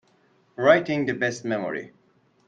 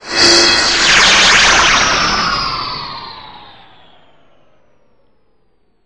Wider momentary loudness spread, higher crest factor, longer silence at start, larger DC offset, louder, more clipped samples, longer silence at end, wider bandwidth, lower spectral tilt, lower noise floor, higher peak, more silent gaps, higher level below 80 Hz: second, 14 LU vs 17 LU; first, 22 dB vs 14 dB; first, 0.6 s vs 0.05 s; second, under 0.1% vs 0.5%; second, -23 LUFS vs -8 LUFS; neither; second, 0.6 s vs 2.5 s; second, 9 kHz vs 11.5 kHz; first, -5.5 dB/octave vs -0.5 dB/octave; about the same, -62 dBFS vs -60 dBFS; second, -4 dBFS vs 0 dBFS; neither; second, -68 dBFS vs -36 dBFS